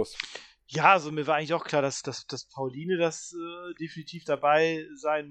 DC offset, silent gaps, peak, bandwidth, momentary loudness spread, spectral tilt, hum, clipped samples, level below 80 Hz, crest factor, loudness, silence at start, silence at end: under 0.1%; none; -6 dBFS; 10.5 kHz; 16 LU; -4 dB/octave; none; under 0.1%; -72 dBFS; 24 dB; -27 LUFS; 0 s; 0 s